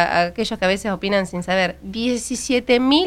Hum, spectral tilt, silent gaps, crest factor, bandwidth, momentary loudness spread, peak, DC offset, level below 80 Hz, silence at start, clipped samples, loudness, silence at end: none; -4 dB/octave; none; 18 dB; 15.5 kHz; 6 LU; 0 dBFS; under 0.1%; -44 dBFS; 0 s; under 0.1%; -20 LUFS; 0 s